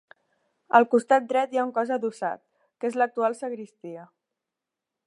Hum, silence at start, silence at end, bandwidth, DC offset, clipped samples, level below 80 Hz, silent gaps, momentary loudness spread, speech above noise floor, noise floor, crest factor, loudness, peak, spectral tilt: none; 0.75 s; 1 s; 11 kHz; under 0.1%; under 0.1%; -84 dBFS; none; 20 LU; 62 dB; -87 dBFS; 22 dB; -25 LUFS; -4 dBFS; -5 dB/octave